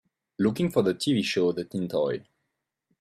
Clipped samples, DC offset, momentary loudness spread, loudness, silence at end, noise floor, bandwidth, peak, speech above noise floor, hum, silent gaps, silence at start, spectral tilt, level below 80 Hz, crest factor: under 0.1%; under 0.1%; 6 LU; -27 LUFS; 0.8 s; -81 dBFS; 15 kHz; -10 dBFS; 56 dB; none; none; 0.4 s; -6 dB/octave; -64 dBFS; 18 dB